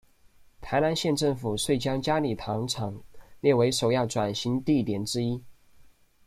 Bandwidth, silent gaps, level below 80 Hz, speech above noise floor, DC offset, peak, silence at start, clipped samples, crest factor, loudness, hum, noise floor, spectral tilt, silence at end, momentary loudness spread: 15.5 kHz; none; -54 dBFS; 30 dB; under 0.1%; -10 dBFS; 0.6 s; under 0.1%; 18 dB; -27 LUFS; none; -57 dBFS; -5 dB/octave; 0.45 s; 8 LU